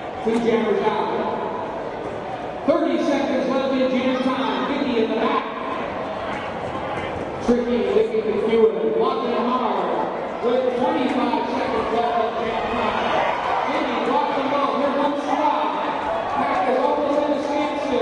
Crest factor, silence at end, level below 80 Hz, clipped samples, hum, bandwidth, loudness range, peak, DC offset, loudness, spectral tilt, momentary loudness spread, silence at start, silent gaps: 16 dB; 0 s; -52 dBFS; under 0.1%; none; 10.5 kHz; 3 LU; -6 dBFS; under 0.1%; -22 LUFS; -5.5 dB/octave; 7 LU; 0 s; none